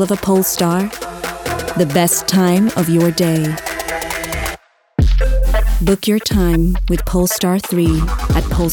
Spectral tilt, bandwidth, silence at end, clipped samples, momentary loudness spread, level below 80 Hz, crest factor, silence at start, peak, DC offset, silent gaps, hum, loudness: -5 dB/octave; 18 kHz; 0 s; under 0.1%; 9 LU; -20 dBFS; 12 dB; 0 s; -2 dBFS; under 0.1%; none; none; -16 LUFS